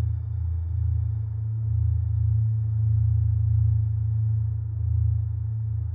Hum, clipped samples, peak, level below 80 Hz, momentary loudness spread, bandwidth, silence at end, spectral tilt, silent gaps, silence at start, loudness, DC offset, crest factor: none; under 0.1%; -14 dBFS; -32 dBFS; 6 LU; 1.1 kHz; 0 s; -13.5 dB/octave; none; 0 s; -25 LUFS; under 0.1%; 10 dB